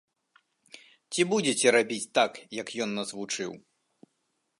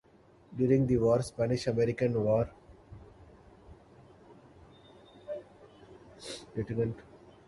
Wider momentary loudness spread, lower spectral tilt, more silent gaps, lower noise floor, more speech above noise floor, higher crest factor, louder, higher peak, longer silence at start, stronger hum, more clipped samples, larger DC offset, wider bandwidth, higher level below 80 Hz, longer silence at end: second, 13 LU vs 21 LU; second, -3 dB/octave vs -7.5 dB/octave; neither; first, -78 dBFS vs -60 dBFS; first, 50 dB vs 32 dB; about the same, 22 dB vs 20 dB; first, -27 LUFS vs -30 LUFS; first, -8 dBFS vs -14 dBFS; first, 0.75 s vs 0.5 s; neither; neither; neither; about the same, 11.5 kHz vs 11.5 kHz; second, -80 dBFS vs -56 dBFS; first, 1 s vs 0.3 s